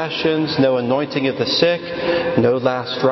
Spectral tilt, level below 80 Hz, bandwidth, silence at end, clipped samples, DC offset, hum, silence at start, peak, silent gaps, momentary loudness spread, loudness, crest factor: -6 dB/octave; -52 dBFS; 6.2 kHz; 0 s; under 0.1%; under 0.1%; none; 0 s; -2 dBFS; none; 4 LU; -18 LUFS; 16 dB